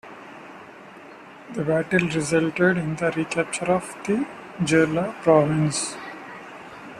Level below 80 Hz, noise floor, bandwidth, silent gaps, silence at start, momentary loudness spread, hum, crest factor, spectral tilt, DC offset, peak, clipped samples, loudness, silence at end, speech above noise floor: -58 dBFS; -44 dBFS; 13 kHz; none; 0.05 s; 23 LU; none; 20 dB; -5.5 dB/octave; under 0.1%; -4 dBFS; under 0.1%; -23 LUFS; 0 s; 22 dB